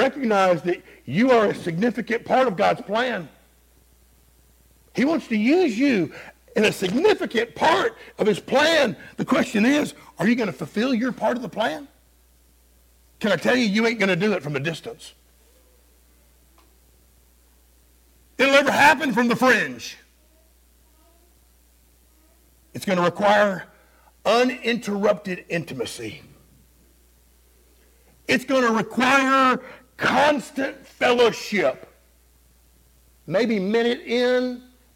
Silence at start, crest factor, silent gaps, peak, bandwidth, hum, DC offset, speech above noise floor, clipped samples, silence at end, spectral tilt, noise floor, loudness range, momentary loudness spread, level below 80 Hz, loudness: 0 s; 20 dB; none; -4 dBFS; 17 kHz; none; under 0.1%; 36 dB; under 0.1%; 0.35 s; -4.5 dB/octave; -57 dBFS; 7 LU; 13 LU; -58 dBFS; -21 LUFS